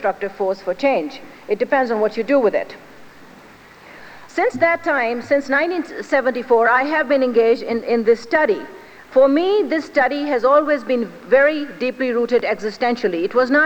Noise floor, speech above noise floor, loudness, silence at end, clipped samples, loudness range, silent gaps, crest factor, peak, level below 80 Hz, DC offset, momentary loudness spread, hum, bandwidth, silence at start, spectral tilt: -44 dBFS; 26 dB; -18 LUFS; 0 s; under 0.1%; 4 LU; none; 16 dB; -4 dBFS; -60 dBFS; under 0.1%; 8 LU; none; 17.5 kHz; 0 s; -5 dB/octave